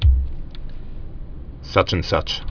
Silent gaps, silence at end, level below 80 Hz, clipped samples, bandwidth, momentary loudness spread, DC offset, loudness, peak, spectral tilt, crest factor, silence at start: none; 0.05 s; -24 dBFS; under 0.1%; 5.4 kHz; 19 LU; under 0.1%; -21 LUFS; 0 dBFS; -6 dB/octave; 22 dB; 0 s